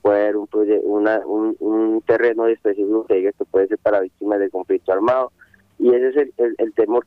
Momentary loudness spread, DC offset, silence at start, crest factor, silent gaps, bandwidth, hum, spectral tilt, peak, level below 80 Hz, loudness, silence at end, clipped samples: 4 LU; under 0.1%; 0.05 s; 14 dB; none; 4.8 kHz; none; -8 dB/octave; -4 dBFS; -62 dBFS; -19 LUFS; 0.05 s; under 0.1%